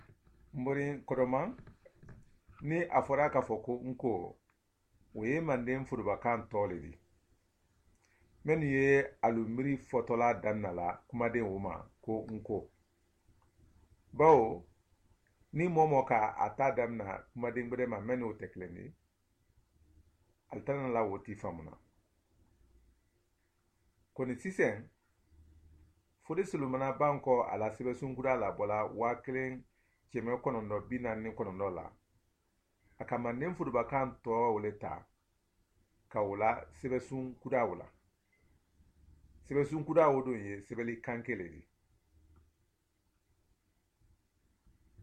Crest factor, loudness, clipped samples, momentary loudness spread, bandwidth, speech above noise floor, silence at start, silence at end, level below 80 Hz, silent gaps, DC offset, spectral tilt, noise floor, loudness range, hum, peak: 24 dB; -34 LUFS; under 0.1%; 15 LU; 9.6 kHz; 44 dB; 0.55 s; 0 s; -64 dBFS; none; under 0.1%; -8 dB/octave; -78 dBFS; 9 LU; none; -12 dBFS